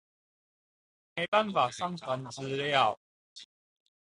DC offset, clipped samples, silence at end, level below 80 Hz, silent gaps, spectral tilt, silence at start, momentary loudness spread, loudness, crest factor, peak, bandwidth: under 0.1%; under 0.1%; 0.55 s; -72 dBFS; 1.28-1.32 s, 2.97-3.36 s; -4 dB/octave; 1.15 s; 21 LU; -30 LUFS; 22 dB; -12 dBFS; 11.5 kHz